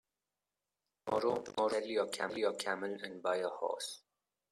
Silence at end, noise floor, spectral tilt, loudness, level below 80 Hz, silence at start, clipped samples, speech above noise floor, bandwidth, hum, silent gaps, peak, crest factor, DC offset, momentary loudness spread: 0.55 s; under -90 dBFS; -3 dB/octave; -37 LUFS; -80 dBFS; 1.05 s; under 0.1%; over 53 dB; 14 kHz; 50 Hz at -70 dBFS; none; -18 dBFS; 20 dB; under 0.1%; 7 LU